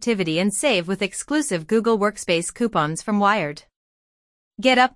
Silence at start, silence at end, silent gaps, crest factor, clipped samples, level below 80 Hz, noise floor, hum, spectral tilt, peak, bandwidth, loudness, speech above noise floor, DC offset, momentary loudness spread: 0 s; 0.05 s; 3.76-4.51 s; 18 dB; under 0.1%; -58 dBFS; under -90 dBFS; none; -4 dB/octave; -2 dBFS; 12 kHz; -21 LUFS; over 69 dB; under 0.1%; 5 LU